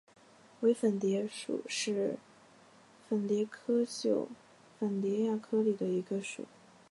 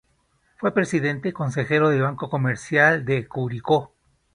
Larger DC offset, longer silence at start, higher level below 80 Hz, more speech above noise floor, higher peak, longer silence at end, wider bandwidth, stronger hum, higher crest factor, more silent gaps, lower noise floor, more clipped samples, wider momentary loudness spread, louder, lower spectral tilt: neither; about the same, 0.6 s vs 0.6 s; second, -84 dBFS vs -58 dBFS; second, 28 dB vs 44 dB; second, -18 dBFS vs -2 dBFS; about the same, 0.45 s vs 0.5 s; about the same, 11.5 kHz vs 11 kHz; neither; about the same, 16 dB vs 20 dB; neither; second, -60 dBFS vs -65 dBFS; neither; about the same, 10 LU vs 9 LU; second, -33 LUFS vs -22 LUFS; about the same, -5.5 dB/octave vs -6.5 dB/octave